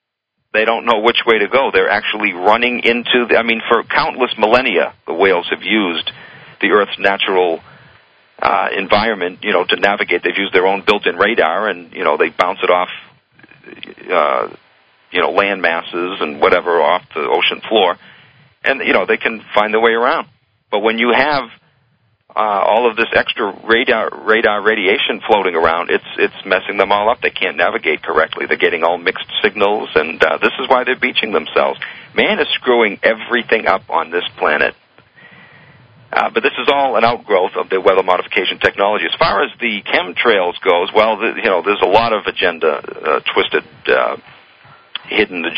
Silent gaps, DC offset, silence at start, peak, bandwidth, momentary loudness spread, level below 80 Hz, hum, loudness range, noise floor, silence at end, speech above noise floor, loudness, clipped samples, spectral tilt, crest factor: none; under 0.1%; 0.55 s; 0 dBFS; 8 kHz; 6 LU; -52 dBFS; none; 3 LU; -73 dBFS; 0 s; 58 dB; -15 LUFS; under 0.1%; -5.5 dB/octave; 16 dB